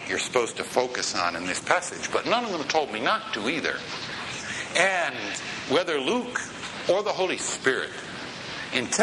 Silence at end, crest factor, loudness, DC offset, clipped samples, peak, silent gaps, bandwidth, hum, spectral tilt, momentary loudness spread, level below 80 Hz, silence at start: 0 s; 22 dB; -26 LUFS; under 0.1%; under 0.1%; -4 dBFS; none; 11.5 kHz; none; -2 dB/octave; 8 LU; -64 dBFS; 0 s